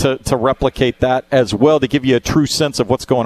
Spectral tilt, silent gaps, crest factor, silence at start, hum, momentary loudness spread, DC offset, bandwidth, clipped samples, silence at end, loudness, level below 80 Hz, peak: -5.5 dB/octave; none; 14 dB; 0 s; none; 4 LU; under 0.1%; 14 kHz; under 0.1%; 0 s; -15 LUFS; -36 dBFS; 0 dBFS